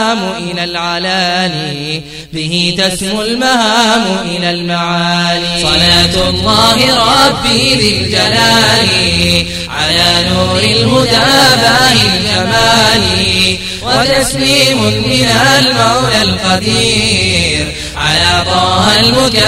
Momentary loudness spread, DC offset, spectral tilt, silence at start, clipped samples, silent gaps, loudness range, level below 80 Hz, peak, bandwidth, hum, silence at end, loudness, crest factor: 8 LU; under 0.1%; -3.5 dB/octave; 0 s; 0.1%; none; 4 LU; -30 dBFS; 0 dBFS; 16.5 kHz; none; 0 s; -9 LUFS; 10 dB